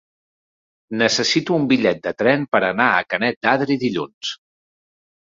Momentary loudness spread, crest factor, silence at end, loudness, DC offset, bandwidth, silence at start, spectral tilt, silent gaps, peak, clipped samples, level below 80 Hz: 11 LU; 18 dB; 1.05 s; -19 LUFS; under 0.1%; 7.8 kHz; 0.9 s; -4 dB/octave; 3.37-3.41 s, 4.14-4.21 s; -2 dBFS; under 0.1%; -60 dBFS